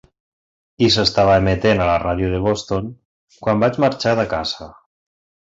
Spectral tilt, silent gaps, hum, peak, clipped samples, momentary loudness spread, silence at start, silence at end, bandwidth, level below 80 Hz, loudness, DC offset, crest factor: -5.5 dB/octave; 3.05-3.28 s; none; -2 dBFS; under 0.1%; 11 LU; 0.8 s; 0.9 s; 8 kHz; -38 dBFS; -17 LUFS; under 0.1%; 16 dB